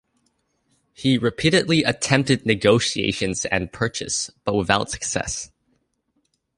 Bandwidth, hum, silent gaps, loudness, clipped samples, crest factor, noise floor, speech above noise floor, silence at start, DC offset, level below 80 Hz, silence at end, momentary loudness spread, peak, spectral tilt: 11.5 kHz; none; none; -21 LUFS; under 0.1%; 20 dB; -70 dBFS; 49 dB; 1 s; under 0.1%; -48 dBFS; 1.1 s; 8 LU; -2 dBFS; -4 dB/octave